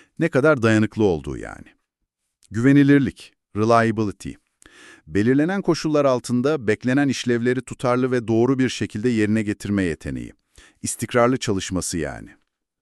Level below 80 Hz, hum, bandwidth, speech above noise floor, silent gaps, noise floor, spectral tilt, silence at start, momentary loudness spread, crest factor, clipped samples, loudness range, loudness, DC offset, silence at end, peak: -48 dBFS; none; 12.5 kHz; 58 dB; none; -78 dBFS; -6 dB/octave; 0.2 s; 14 LU; 18 dB; under 0.1%; 3 LU; -20 LUFS; under 0.1%; 0.55 s; -4 dBFS